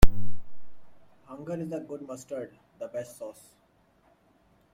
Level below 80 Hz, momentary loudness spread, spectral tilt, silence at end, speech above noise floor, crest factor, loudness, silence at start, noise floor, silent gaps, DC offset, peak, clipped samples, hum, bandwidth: -34 dBFS; 14 LU; -6 dB/octave; 1.45 s; 27 dB; 22 dB; -37 LUFS; 0 s; -65 dBFS; none; under 0.1%; -2 dBFS; under 0.1%; none; 16.5 kHz